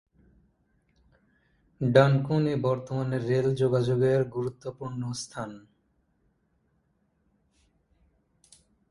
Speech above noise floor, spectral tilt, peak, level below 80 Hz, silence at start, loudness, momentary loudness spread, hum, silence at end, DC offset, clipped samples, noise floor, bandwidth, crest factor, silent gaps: 46 dB; -7 dB/octave; -6 dBFS; -62 dBFS; 1.8 s; -27 LUFS; 15 LU; none; 3.3 s; under 0.1%; under 0.1%; -71 dBFS; 11.5 kHz; 24 dB; none